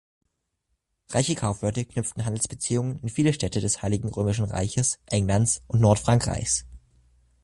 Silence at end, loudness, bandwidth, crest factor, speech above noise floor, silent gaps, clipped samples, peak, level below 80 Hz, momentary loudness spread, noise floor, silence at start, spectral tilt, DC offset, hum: 0.65 s; -25 LUFS; 11.5 kHz; 20 dB; 52 dB; none; under 0.1%; -6 dBFS; -44 dBFS; 7 LU; -77 dBFS; 1.1 s; -5 dB/octave; under 0.1%; none